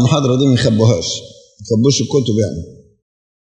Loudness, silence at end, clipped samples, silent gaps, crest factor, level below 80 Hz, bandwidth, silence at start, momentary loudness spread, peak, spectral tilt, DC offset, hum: -15 LUFS; 0.7 s; under 0.1%; none; 14 dB; -48 dBFS; 9.4 kHz; 0 s; 9 LU; 0 dBFS; -5.5 dB/octave; under 0.1%; none